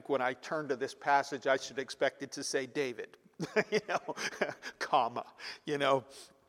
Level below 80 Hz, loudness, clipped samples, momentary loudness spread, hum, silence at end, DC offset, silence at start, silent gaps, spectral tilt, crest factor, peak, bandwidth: -82 dBFS; -34 LUFS; under 0.1%; 11 LU; none; 0.25 s; under 0.1%; 0.1 s; none; -3.5 dB/octave; 22 dB; -12 dBFS; 15.5 kHz